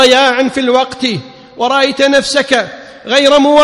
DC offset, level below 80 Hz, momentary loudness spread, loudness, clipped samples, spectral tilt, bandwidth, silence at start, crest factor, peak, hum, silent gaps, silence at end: under 0.1%; -48 dBFS; 11 LU; -11 LUFS; 0.4%; -3 dB/octave; 11.5 kHz; 0 s; 10 dB; 0 dBFS; none; none; 0 s